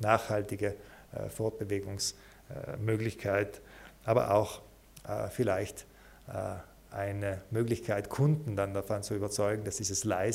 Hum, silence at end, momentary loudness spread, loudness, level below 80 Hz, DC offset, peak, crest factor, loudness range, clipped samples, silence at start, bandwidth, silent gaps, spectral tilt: none; 0 s; 16 LU; -33 LUFS; -58 dBFS; under 0.1%; -10 dBFS; 24 dB; 3 LU; under 0.1%; 0 s; 16 kHz; none; -5 dB/octave